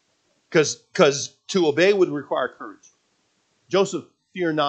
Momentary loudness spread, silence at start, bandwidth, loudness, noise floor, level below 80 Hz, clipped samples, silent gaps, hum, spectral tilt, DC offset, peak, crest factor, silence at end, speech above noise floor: 14 LU; 0.5 s; 8.8 kHz; -21 LUFS; -68 dBFS; -78 dBFS; under 0.1%; none; none; -4 dB/octave; under 0.1%; -2 dBFS; 22 dB; 0 s; 47 dB